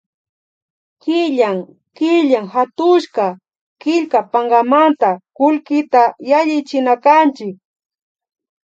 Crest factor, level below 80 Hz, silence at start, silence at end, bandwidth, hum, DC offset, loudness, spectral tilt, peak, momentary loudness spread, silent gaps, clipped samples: 16 dB; -76 dBFS; 1.05 s; 1.2 s; 7.8 kHz; none; under 0.1%; -15 LUFS; -5.5 dB/octave; 0 dBFS; 9 LU; 3.61-3.76 s; under 0.1%